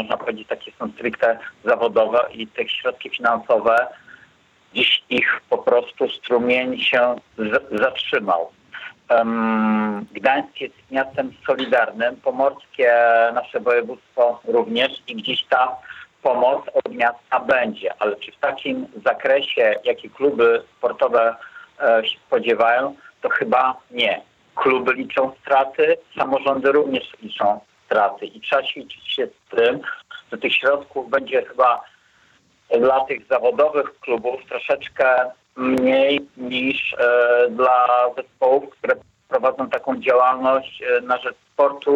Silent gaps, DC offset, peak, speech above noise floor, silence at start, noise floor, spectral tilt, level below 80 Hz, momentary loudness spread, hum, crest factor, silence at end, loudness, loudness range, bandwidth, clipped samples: none; under 0.1%; -6 dBFS; 38 dB; 0 s; -58 dBFS; -5.5 dB/octave; -66 dBFS; 10 LU; none; 14 dB; 0 s; -20 LUFS; 3 LU; 7.6 kHz; under 0.1%